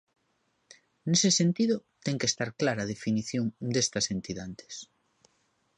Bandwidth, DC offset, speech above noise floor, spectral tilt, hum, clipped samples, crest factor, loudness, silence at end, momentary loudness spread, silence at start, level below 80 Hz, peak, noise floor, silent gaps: 11 kHz; under 0.1%; 45 dB; -4 dB/octave; none; under 0.1%; 20 dB; -28 LUFS; 0.95 s; 16 LU; 1.05 s; -64 dBFS; -12 dBFS; -74 dBFS; none